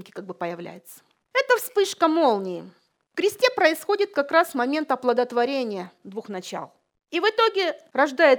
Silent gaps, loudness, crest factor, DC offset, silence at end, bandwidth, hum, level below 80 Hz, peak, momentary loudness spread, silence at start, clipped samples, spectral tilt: none; -23 LUFS; 20 dB; under 0.1%; 0 s; over 20 kHz; none; -82 dBFS; -4 dBFS; 16 LU; 0 s; under 0.1%; -3.5 dB/octave